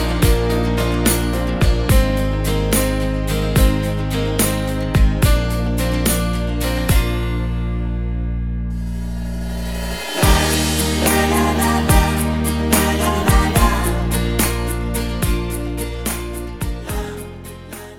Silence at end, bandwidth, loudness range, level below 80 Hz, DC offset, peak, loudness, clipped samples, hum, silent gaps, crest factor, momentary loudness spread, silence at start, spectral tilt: 0 s; 18 kHz; 6 LU; -22 dBFS; 0.5%; 0 dBFS; -18 LUFS; under 0.1%; none; none; 16 dB; 10 LU; 0 s; -5 dB/octave